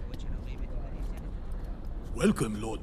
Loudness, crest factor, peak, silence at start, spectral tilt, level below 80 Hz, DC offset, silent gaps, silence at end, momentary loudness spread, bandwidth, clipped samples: -35 LUFS; 20 dB; -14 dBFS; 0 s; -6 dB/octave; -36 dBFS; under 0.1%; none; 0 s; 14 LU; 14 kHz; under 0.1%